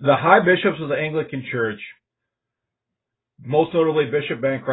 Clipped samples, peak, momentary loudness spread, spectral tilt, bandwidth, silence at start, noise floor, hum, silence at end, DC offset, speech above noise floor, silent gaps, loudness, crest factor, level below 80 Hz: under 0.1%; 0 dBFS; 12 LU; -11 dB/octave; 4.1 kHz; 0 s; -83 dBFS; none; 0 s; under 0.1%; 64 dB; none; -20 LUFS; 20 dB; -62 dBFS